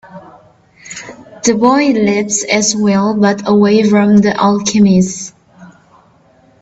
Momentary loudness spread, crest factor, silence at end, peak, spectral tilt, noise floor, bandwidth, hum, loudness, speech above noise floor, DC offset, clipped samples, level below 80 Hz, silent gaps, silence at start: 19 LU; 12 dB; 0.95 s; 0 dBFS; -5 dB/octave; -48 dBFS; 8 kHz; none; -11 LUFS; 38 dB; under 0.1%; under 0.1%; -52 dBFS; none; 0.15 s